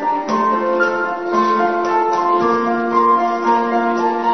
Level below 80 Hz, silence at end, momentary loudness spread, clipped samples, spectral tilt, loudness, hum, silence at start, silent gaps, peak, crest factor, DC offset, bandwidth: -60 dBFS; 0 s; 3 LU; under 0.1%; -5.5 dB/octave; -16 LUFS; none; 0 s; none; -2 dBFS; 14 dB; 0.5%; 6.4 kHz